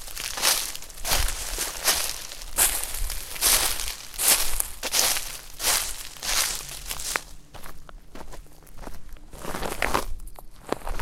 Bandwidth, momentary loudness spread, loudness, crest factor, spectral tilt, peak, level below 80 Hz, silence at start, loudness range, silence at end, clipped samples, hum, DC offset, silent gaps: 17 kHz; 24 LU; -24 LUFS; 28 dB; 0 dB/octave; 0 dBFS; -36 dBFS; 0 s; 12 LU; 0 s; under 0.1%; none; under 0.1%; none